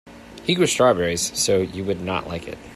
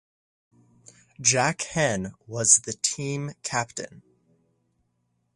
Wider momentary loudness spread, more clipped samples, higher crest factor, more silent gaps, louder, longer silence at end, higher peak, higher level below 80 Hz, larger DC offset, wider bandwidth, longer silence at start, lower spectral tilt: second, 12 LU vs 16 LU; neither; second, 18 dB vs 26 dB; neither; first, -21 LUFS vs -24 LUFS; second, 0 s vs 1.35 s; about the same, -4 dBFS vs -2 dBFS; first, -50 dBFS vs -60 dBFS; neither; first, 15 kHz vs 11.5 kHz; second, 0.05 s vs 1.2 s; about the same, -3.5 dB/octave vs -2.5 dB/octave